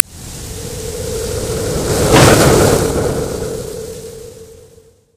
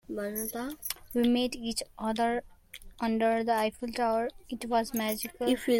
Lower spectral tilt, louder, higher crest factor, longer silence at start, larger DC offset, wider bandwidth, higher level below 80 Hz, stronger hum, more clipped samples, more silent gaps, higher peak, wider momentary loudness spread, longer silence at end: about the same, -4.5 dB/octave vs -3.5 dB/octave; first, -14 LUFS vs -31 LUFS; about the same, 16 dB vs 16 dB; about the same, 0.1 s vs 0.1 s; neither; about the same, 17.5 kHz vs 17 kHz; first, -28 dBFS vs -56 dBFS; neither; first, 0.2% vs under 0.1%; neither; first, 0 dBFS vs -14 dBFS; first, 21 LU vs 9 LU; first, 0.55 s vs 0 s